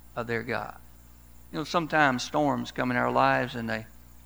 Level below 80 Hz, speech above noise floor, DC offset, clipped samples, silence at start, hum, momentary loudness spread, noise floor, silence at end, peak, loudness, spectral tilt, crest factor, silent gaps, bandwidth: -54 dBFS; 25 dB; 0.2%; under 0.1%; 0.15 s; 60 Hz at -50 dBFS; 12 LU; -52 dBFS; 0.4 s; -8 dBFS; -27 LUFS; -5 dB/octave; 22 dB; none; over 20 kHz